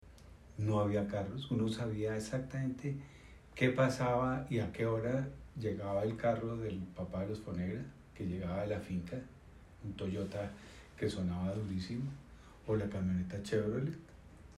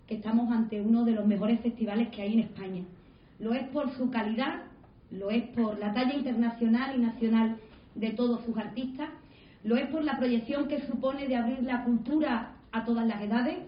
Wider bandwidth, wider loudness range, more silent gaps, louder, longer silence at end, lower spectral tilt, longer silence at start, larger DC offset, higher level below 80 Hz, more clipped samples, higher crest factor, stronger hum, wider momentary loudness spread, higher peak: first, 13 kHz vs 5.4 kHz; first, 6 LU vs 3 LU; neither; second, -38 LUFS vs -30 LUFS; about the same, 0 s vs 0 s; second, -7 dB/octave vs -10.5 dB/octave; about the same, 0.05 s vs 0.1 s; neither; about the same, -58 dBFS vs -62 dBFS; neither; first, 20 dB vs 14 dB; neither; first, 17 LU vs 11 LU; about the same, -18 dBFS vs -16 dBFS